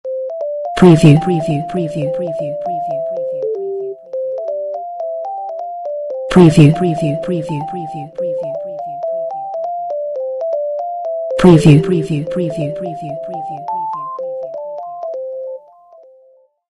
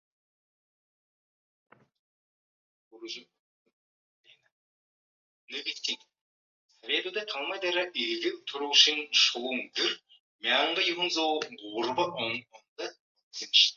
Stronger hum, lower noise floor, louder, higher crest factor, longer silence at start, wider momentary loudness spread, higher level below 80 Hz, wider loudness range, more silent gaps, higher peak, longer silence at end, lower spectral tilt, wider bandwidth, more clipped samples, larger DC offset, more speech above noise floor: neither; second, -50 dBFS vs under -90 dBFS; first, -16 LUFS vs -27 LUFS; second, 16 dB vs 26 dB; second, 0.05 s vs 2.95 s; second, 16 LU vs 19 LU; first, -44 dBFS vs -84 dBFS; second, 9 LU vs 24 LU; second, none vs 3.39-3.65 s, 3.73-4.24 s, 4.52-5.48 s, 6.21-6.69 s, 10.20-10.39 s, 12.68-12.76 s, 13.00-13.15 s, 13.23-13.31 s; first, 0 dBFS vs -6 dBFS; first, 1.1 s vs 0.05 s; first, -8 dB/octave vs -0.5 dB/octave; first, 11 kHz vs 7.6 kHz; first, 0.2% vs under 0.1%; neither; second, 38 dB vs over 61 dB